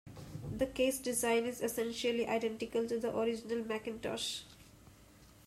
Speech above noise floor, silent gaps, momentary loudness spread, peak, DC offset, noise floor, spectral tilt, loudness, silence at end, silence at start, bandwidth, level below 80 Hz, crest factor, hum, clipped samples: 25 dB; none; 10 LU; -22 dBFS; under 0.1%; -60 dBFS; -3.5 dB/octave; -36 LUFS; 0.15 s; 0.05 s; 16 kHz; -62 dBFS; 16 dB; none; under 0.1%